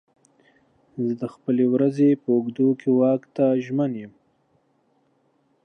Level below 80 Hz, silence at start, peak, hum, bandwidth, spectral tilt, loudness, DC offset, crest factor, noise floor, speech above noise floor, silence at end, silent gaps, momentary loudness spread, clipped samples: -76 dBFS; 0.95 s; -8 dBFS; none; 6.6 kHz; -9.5 dB/octave; -22 LUFS; under 0.1%; 14 dB; -66 dBFS; 45 dB; 1.55 s; none; 10 LU; under 0.1%